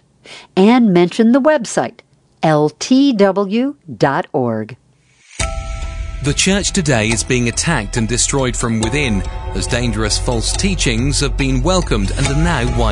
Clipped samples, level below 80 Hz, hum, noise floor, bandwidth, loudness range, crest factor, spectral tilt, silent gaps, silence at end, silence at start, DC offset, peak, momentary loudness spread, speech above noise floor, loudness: under 0.1%; -26 dBFS; none; -52 dBFS; 11 kHz; 4 LU; 16 dB; -4.5 dB/octave; none; 0 s; 0.25 s; under 0.1%; 0 dBFS; 10 LU; 37 dB; -15 LUFS